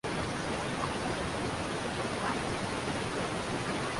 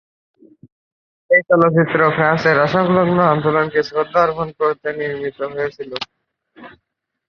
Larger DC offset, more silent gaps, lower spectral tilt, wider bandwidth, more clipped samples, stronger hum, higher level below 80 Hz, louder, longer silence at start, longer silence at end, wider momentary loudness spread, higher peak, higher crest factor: neither; neither; second, -4.5 dB/octave vs -7.5 dB/octave; first, 11.5 kHz vs 6.8 kHz; neither; neither; about the same, -50 dBFS vs -54 dBFS; second, -34 LUFS vs -16 LUFS; second, 0.05 s vs 1.3 s; second, 0 s vs 0.6 s; second, 1 LU vs 11 LU; second, -20 dBFS vs 0 dBFS; about the same, 14 dB vs 18 dB